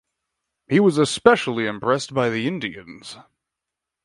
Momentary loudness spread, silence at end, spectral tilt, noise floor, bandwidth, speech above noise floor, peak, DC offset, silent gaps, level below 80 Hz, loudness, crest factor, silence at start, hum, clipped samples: 21 LU; 0.85 s; -5 dB/octave; -85 dBFS; 11.5 kHz; 64 dB; 0 dBFS; under 0.1%; none; -60 dBFS; -20 LUFS; 22 dB; 0.7 s; none; under 0.1%